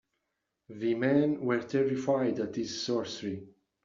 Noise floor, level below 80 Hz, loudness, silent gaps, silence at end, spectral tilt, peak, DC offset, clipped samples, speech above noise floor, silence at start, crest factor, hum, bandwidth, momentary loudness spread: -83 dBFS; -72 dBFS; -30 LUFS; none; 0.35 s; -5 dB/octave; -14 dBFS; under 0.1%; under 0.1%; 54 dB; 0.7 s; 18 dB; none; 7.6 kHz; 11 LU